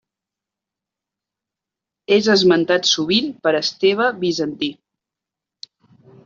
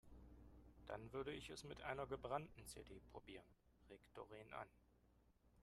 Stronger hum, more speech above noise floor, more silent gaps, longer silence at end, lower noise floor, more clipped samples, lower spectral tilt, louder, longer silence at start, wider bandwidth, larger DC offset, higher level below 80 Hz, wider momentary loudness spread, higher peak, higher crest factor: second, none vs 60 Hz at -70 dBFS; first, 69 dB vs 23 dB; neither; first, 1.5 s vs 0 s; first, -86 dBFS vs -76 dBFS; neither; about the same, -3.5 dB/octave vs -4.5 dB/octave; first, -17 LUFS vs -54 LUFS; first, 2.1 s vs 0.05 s; second, 7.4 kHz vs 13 kHz; neither; first, -62 dBFS vs -70 dBFS; second, 9 LU vs 17 LU; first, -2 dBFS vs -32 dBFS; second, 18 dB vs 24 dB